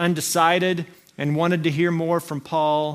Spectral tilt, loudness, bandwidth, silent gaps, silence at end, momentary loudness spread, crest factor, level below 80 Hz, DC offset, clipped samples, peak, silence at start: -5 dB/octave; -21 LUFS; 16 kHz; none; 0 s; 9 LU; 18 dB; -66 dBFS; under 0.1%; under 0.1%; -4 dBFS; 0 s